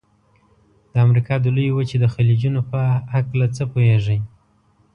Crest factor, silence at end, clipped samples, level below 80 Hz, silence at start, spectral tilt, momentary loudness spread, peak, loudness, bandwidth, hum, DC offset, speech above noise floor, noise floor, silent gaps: 14 dB; 0.65 s; under 0.1%; -48 dBFS; 0.95 s; -8.5 dB/octave; 6 LU; -4 dBFS; -19 LUFS; 7 kHz; none; under 0.1%; 41 dB; -58 dBFS; none